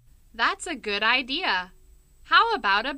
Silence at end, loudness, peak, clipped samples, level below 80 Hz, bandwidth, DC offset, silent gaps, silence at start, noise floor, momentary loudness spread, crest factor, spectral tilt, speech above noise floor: 0 s; -23 LUFS; -6 dBFS; under 0.1%; -54 dBFS; 15.5 kHz; under 0.1%; none; 0.35 s; -53 dBFS; 9 LU; 20 dB; -1.5 dB/octave; 29 dB